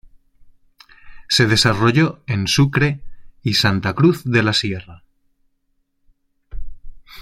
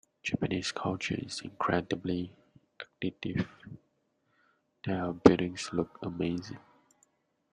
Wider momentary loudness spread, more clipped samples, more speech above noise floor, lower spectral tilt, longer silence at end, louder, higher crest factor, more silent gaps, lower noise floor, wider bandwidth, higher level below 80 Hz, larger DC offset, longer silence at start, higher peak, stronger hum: second, 10 LU vs 21 LU; neither; first, 50 dB vs 44 dB; about the same, -5 dB/octave vs -6 dB/octave; second, 0 s vs 0.95 s; first, -17 LUFS vs -32 LUFS; second, 18 dB vs 30 dB; neither; second, -66 dBFS vs -75 dBFS; first, 15.5 kHz vs 10.5 kHz; first, -42 dBFS vs -60 dBFS; neither; first, 1.05 s vs 0.25 s; about the same, -2 dBFS vs -4 dBFS; neither